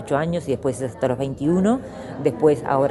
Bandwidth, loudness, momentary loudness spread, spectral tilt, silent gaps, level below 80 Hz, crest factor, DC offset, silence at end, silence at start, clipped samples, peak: 11.5 kHz; -22 LUFS; 7 LU; -7.5 dB/octave; none; -50 dBFS; 16 dB; under 0.1%; 0 s; 0 s; under 0.1%; -4 dBFS